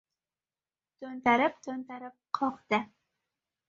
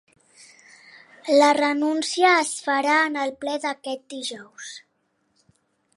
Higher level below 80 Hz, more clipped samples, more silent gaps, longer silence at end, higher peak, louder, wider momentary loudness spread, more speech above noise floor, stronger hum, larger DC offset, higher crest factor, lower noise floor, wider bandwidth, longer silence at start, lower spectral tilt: about the same, -76 dBFS vs -78 dBFS; neither; neither; second, 0.85 s vs 1.15 s; second, -10 dBFS vs -6 dBFS; second, -30 LUFS vs -21 LUFS; about the same, 19 LU vs 20 LU; first, over 60 dB vs 49 dB; neither; neither; about the same, 22 dB vs 18 dB; first, under -90 dBFS vs -71 dBFS; second, 7.4 kHz vs 11.5 kHz; second, 1 s vs 1.25 s; first, -5 dB/octave vs -1 dB/octave